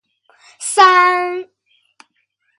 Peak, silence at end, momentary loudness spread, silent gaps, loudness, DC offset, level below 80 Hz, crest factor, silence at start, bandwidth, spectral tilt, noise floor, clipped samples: 0 dBFS; 1.15 s; 17 LU; none; -12 LUFS; under 0.1%; -70 dBFS; 16 dB; 0.6 s; 11.5 kHz; 0 dB/octave; -66 dBFS; under 0.1%